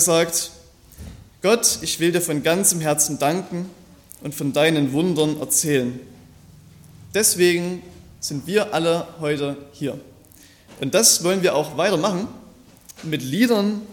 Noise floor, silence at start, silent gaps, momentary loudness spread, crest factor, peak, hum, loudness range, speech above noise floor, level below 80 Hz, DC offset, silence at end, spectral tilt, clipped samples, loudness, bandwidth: -49 dBFS; 0 s; none; 15 LU; 20 dB; -2 dBFS; none; 2 LU; 29 dB; -54 dBFS; under 0.1%; 0 s; -3.5 dB/octave; under 0.1%; -20 LUFS; 17.5 kHz